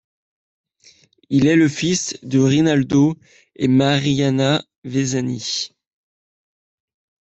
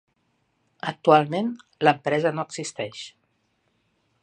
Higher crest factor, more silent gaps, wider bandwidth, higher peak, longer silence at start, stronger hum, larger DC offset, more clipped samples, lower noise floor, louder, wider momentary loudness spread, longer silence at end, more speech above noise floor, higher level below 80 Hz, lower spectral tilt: second, 16 dB vs 24 dB; first, 4.78-4.82 s vs none; second, 8.2 kHz vs 9.6 kHz; about the same, -4 dBFS vs -2 dBFS; first, 1.3 s vs 0.85 s; neither; neither; neither; second, -53 dBFS vs -70 dBFS; first, -18 LUFS vs -24 LUFS; second, 8 LU vs 15 LU; first, 1.55 s vs 1.15 s; second, 36 dB vs 48 dB; first, -54 dBFS vs -74 dBFS; about the same, -5.5 dB/octave vs -5 dB/octave